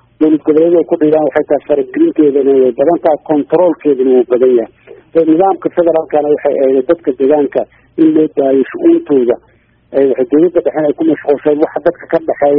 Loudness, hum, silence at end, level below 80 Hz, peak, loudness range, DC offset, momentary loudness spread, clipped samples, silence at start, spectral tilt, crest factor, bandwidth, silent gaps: -11 LUFS; none; 0 s; -54 dBFS; 0 dBFS; 2 LU; under 0.1%; 5 LU; under 0.1%; 0.2 s; -6.5 dB/octave; 10 dB; 3.9 kHz; none